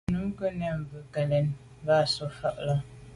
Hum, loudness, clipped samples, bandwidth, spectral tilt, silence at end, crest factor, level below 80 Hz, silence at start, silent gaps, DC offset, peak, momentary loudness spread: none; -29 LUFS; under 0.1%; 11.5 kHz; -6.5 dB/octave; 0 s; 16 dB; -52 dBFS; 0.1 s; none; under 0.1%; -12 dBFS; 9 LU